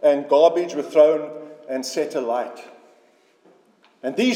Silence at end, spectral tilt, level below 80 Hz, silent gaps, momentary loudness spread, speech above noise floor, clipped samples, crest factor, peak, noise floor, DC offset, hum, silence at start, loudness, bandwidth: 0 s; -4 dB/octave; under -90 dBFS; none; 18 LU; 38 dB; under 0.1%; 18 dB; -4 dBFS; -58 dBFS; under 0.1%; none; 0 s; -20 LUFS; 14.5 kHz